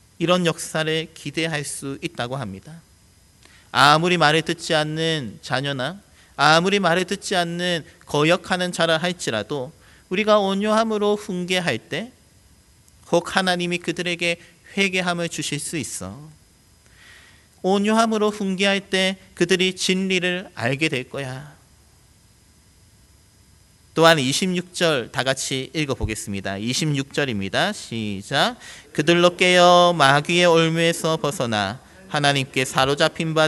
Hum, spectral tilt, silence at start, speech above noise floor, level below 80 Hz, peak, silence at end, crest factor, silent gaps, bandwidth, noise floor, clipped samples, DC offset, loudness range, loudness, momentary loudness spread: none; -4 dB/octave; 0.2 s; 33 dB; -52 dBFS; 0 dBFS; 0 s; 22 dB; none; 12 kHz; -54 dBFS; under 0.1%; under 0.1%; 8 LU; -20 LUFS; 13 LU